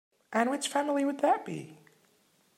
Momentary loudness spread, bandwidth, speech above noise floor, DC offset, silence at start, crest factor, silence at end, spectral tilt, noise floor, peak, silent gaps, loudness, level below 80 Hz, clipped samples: 13 LU; 16 kHz; 39 dB; under 0.1%; 0.3 s; 18 dB; 0.85 s; -4 dB/octave; -68 dBFS; -14 dBFS; none; -30 LUFS; -86 dBFS; under 0.1%